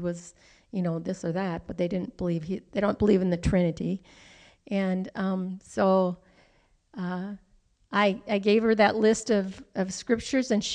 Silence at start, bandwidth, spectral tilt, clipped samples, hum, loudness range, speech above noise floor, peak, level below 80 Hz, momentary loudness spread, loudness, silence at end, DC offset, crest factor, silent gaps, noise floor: 0 s; 10 kHz; -6 dB/octave; under 0.1%; none; 4 LU; 38 dB; -10 dBFS; -50 dBFS; 12 LU; -27 LUFS; 0 s; under 0.1%; 18 dB; none; -64 dBFS